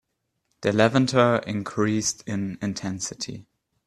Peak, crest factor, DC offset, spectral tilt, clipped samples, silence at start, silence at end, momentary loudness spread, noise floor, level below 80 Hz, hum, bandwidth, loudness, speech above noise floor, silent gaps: -2 dBFS; 22 dB; under 0.1%; -4.5 dB/octave; under 0.1%; 0.6 s; 0.45 s; 11 LU; -75 dBFS; -60 dBFS; none; 13 kHz; -24 LUFS; 52 dB; none